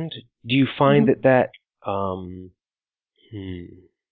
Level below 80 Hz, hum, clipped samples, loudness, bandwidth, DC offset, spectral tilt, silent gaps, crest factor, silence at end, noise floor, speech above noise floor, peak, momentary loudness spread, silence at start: -52 dBFS; none; under 0.1%; -20 LUFS; 4.6 kHz; under 0.1%; -11.5 dB/octave; none; 20 dB; 0.45 s; under -90 dBFS; over 69 dB; -4 dBFS; 21 LU; 0 s